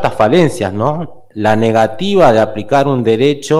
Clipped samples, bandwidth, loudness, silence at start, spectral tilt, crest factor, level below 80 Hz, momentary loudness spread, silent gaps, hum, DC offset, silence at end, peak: under 0.1%; 15 kHz; -12 LUFS; 0 s; -6.5 dB/octave; 12 dB; -42 dBFS; 8 LU; none; none; under 0.1%; 0 s; 0 dBFS